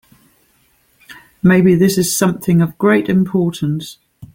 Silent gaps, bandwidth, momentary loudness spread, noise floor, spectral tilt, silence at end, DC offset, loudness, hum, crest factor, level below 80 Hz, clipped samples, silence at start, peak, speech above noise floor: none; 17 kHz; 10 LU; -57 dBFS; -6 dB/octave; 0.1 s; under 0.1%; -14 LUFS; none; 14 dB; -50 dBFS; under 0.1%; 1.1 s; -2 dBFS; 43 dB